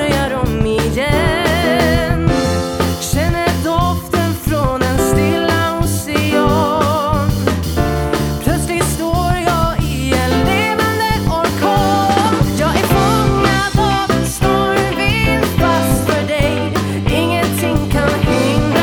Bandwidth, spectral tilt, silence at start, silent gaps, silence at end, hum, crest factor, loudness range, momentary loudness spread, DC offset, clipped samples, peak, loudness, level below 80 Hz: over 20 kHz; -5.5 dB/octave; 0 s; none; 0 s; none; 14 dB; 2 LU; 4 LU; 0.2%; under 0.1%; 0 dBFS; -15 LUFS; -26 dBFS